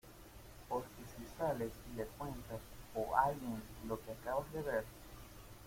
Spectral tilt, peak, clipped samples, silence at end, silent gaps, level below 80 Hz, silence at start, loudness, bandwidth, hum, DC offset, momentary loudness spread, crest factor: -5.5 dB/octave; -16 dBFS; under 0.1%; 0 s; none; -58 dBFS; 0.05 s; -42 LUFS; 16.5 kHz; none; under 0.1%; 19 LU; 26 dB